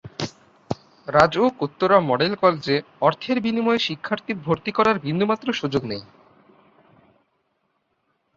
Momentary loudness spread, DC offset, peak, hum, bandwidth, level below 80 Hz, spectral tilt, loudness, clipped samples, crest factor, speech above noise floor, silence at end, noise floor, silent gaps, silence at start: 14 LU; under 0.1%; -2 dBFS; none; 7.8 kHz; -58 dBFS; -6 dB/octave; -21 LUFS; under 0.1%; 22 dB; 50 dB; 2.35 s; -71 dBFS; none; 0.05 s